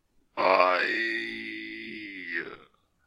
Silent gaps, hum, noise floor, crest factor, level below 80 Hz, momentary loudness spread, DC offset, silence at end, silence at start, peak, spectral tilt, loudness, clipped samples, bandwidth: none; none; -59 dBFS; 22 dB; -72 dBFS; 16 LU; under 0.1%; 0.45 s; 0.35 s; -8 dBFS; -4 dB/octave; -27 LUFS; under 0.1%; 13.5 kHz